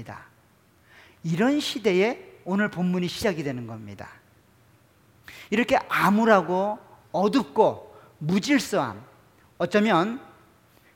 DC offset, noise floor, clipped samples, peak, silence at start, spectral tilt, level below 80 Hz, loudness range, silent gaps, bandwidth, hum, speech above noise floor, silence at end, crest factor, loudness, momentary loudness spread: under 0.1%; -60 dBFS; under 0.1%; -4 dBFS; 0 s; -5.5 dB/octave; -62 dBFS; 6 LU; none; 17 kHz; none; 36 dB; 0.7 s; 22 dB; -24 LUFS; 19 LU